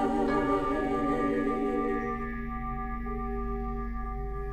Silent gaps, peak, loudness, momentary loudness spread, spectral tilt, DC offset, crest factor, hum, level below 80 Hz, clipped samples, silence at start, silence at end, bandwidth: none; -16 dBFS; -31 LUFS; 9 LU; -8 dB/octave; under 0.1%; 14 dB; none; -38 dBFS; under 0.1%; 0 s; 0 s; 12.5 kHz